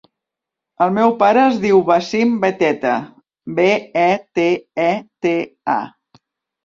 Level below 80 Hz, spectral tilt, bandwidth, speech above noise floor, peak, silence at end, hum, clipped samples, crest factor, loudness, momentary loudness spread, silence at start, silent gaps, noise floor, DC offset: -60 dBFS; -6 dB/octave; 7.6 kHz; 68 dB; -2 dBFS; 0.8 s; none; under 0.1%; 16 dB; -17 LUFS; 9 LU; 0.8 s; none; -84 dBFS; under 0.1%